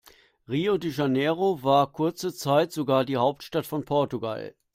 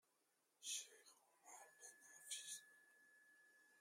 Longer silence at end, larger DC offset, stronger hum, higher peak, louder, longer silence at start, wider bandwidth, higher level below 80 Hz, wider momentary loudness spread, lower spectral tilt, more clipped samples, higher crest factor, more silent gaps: first, 0.25 s vs 0 s; neither; neither; first, -8 dBFS vs -36 dBFS; first, -26 LUFS vs -54 LUFS; about the same, 0.5 s vs 0.6 s; about the same, 16 kHz vs 16 kHz; first, -64 dBFS vs under -90 dBFS; second, 9 LU vs 18 LU; first, -6 dB/octave vs 3.5 dB/octave; neither; second, 18 dB vs 24 dB; neither